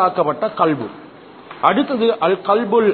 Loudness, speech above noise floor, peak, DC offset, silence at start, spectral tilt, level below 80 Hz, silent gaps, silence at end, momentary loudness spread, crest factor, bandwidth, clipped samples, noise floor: -17 LUFS; 22 dB; 0 dBFS; under 0.1%; 0 s; -9.5 dB/octave; -62 dBFS; none; 0 s; 8 LU; 18 dB; 4.5 kHz; under 0.1%; -39 dBFS